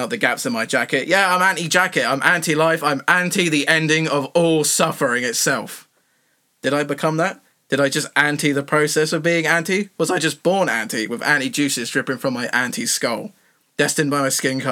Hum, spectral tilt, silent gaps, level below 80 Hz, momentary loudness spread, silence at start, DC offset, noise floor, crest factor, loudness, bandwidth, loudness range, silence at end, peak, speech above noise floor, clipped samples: none; -3.5 dB/octave; none; -74 dBFS; 6 LU; 0 s; under 0.1%; -64 dBFS; 20 dB; -18 LUFS; 19 kHz; 4 LU; 0 s; 0 dBFS; 45 dB; under 0.1%